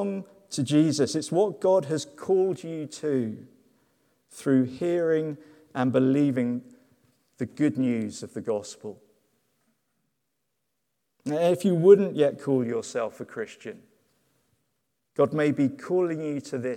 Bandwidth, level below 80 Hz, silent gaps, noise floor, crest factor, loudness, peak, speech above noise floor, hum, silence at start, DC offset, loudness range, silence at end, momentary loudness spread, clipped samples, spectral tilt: 14 kHz; -76 dBFS; none; -80 dBFS; 22 dB; -25 LUFS; -4 dBFS; 55 dB; none; 0 s; under 0.1%; 7 LU; 0 s; 15 LU; under 0.1%; -6.5 dB/octave